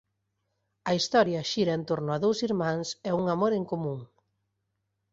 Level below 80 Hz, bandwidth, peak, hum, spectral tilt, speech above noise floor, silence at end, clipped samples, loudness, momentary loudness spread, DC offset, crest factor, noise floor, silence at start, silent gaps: -66 dBFS; 8 kHz; -10 dBFS; none; -5.5 dB/octave; 52 dB; 1.05 s; under 0.1%; -28 LUFS; 8 LU; under 0.1%; 20 dB; -80 dBFS; 0.85 s; none